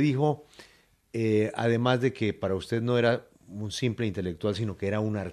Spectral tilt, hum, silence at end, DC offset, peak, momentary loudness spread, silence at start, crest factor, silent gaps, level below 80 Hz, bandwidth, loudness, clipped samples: -6.5 dB/octave; none; 0 s; under 0.1%; -10 dBFS; 9 LU; 0 s; 18 dB; none; -64 dBFS; 12.5 kHz; -28 LUFS; under 0.1%